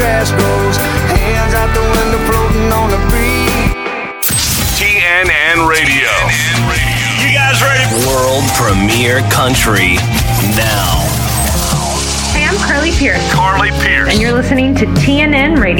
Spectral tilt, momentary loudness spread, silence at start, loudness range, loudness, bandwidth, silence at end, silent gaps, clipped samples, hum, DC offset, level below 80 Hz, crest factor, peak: -4 dB/octave; 4 LU; 0 s; 3 LU; -11 LUFS; over 20 kHz; 0 s; none; under 0.1%; none; under 0.1%; -20 dBFS; 12 dB; 0 dBFS